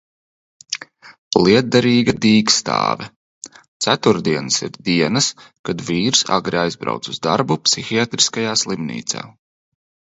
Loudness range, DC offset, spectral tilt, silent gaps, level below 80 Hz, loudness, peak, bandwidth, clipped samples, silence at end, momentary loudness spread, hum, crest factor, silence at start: 3 LU; under 0.1%; -3.5 dB/octave; 1.18-1.31 s, 3.16-3.42 s, 3.68-3.80 s, 5.59-5.64 s; -54 dBFS; -17 LUFS; 0 dBFS; 8.2 kHz; under 0.1%; 0.85 s; 14 LU; none; 18 dB; 0.7 s